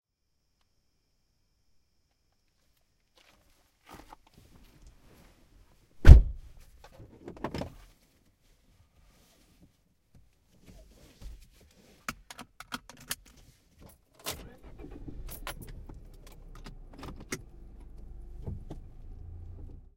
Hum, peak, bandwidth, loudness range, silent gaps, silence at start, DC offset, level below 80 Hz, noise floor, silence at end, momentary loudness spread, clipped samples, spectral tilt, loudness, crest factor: none; 0 dBFS; 16.5 kHz; 20 LU; none; 6.05 s; under 0.1%; -32 dBFS; -77 dBFS; 1.45 s; 18 LU; under 0.1%; -6 dB/octave; -28 LUFS; 30 dB